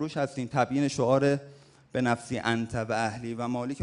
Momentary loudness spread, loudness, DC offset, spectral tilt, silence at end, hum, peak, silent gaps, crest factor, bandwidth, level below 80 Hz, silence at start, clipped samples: 8 LU; -29 LUFS; under 0.1%; -6 dB/octave; 0 s; none; -10 dBFS; none; 18 dB; 11 kHz; -60 dBFS; 0 s; under 0.1%